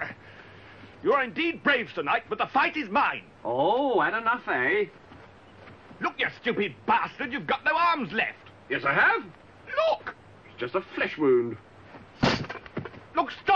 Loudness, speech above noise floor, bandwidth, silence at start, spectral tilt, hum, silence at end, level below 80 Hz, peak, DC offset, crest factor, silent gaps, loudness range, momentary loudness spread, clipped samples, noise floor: -26 LUFS; 24 dB; 7.4 kHz; 0 s; -5.5 dB/octave; none; 0 s; -60 dBFS; -10 dBFS; under 0.1%; 18 dB; none; 3 LU; 12 LU; under 0.1%; -50 dBFS